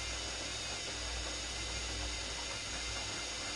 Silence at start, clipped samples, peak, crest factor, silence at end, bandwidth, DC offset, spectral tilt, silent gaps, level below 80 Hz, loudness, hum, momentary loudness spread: 0 s; under 0.1%; -28 dBFS; 12 dB; 0 s; 11.5 kHz; under 0.1%; -1.5 dB/octave; none; -48 dBFS; -38 LUFS; none; 1 LU